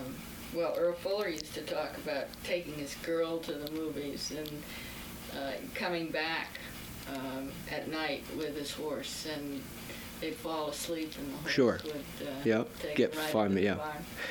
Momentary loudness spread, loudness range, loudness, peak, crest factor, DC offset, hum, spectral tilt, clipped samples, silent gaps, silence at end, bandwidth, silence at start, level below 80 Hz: 12 LU; 6 LU; -35 LUFS; -14 dBFS; 20 dB; under 0.1%; none; -4.5 dB/octave; under 0.1%; none; 0 s; over 20 kHz; 0 s; -58 dBFS